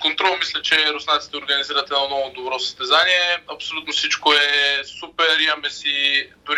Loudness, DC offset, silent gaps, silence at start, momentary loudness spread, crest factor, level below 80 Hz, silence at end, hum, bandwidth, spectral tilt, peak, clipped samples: -18 LUFS; under 0.1%; none; 0 s; 9 LU; 16 dB; -62 dBFS; 0 s; none; 15.5 kHz; 0 dB/octave; -4 dBFS; under 0.1%